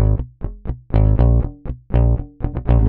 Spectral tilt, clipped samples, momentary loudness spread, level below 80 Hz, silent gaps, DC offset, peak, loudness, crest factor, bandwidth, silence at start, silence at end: -12.5 dB/octave; under 0.1%; 15 LU; -20 dBFS; none; under 0.1%; -2 dBFS; -19 LUFS; 14 dB; 3.3 kHz; 0 s; 0 s